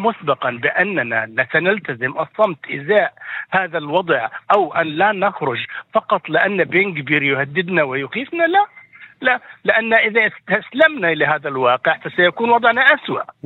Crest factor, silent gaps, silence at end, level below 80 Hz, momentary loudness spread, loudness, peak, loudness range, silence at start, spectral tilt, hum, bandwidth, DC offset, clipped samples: 18 dB; none; 0.15 s; -70 dBFS; 8 LU; -17 LUFS; 0 dBFS; 3 LU; 0 s; -7.5 dB/octave; none; 4.4 kHz; under 0.1%; under 0.1%